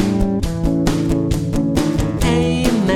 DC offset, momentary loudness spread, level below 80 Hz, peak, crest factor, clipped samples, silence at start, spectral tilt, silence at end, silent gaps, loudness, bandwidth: under 0.1%; 3 LU; -26 dBFS; -2 dBFS; 14 dB; under 0.1%; 0 s; -6.5 dB/octave; 0 s; none; -18 LUFS; 17 kHz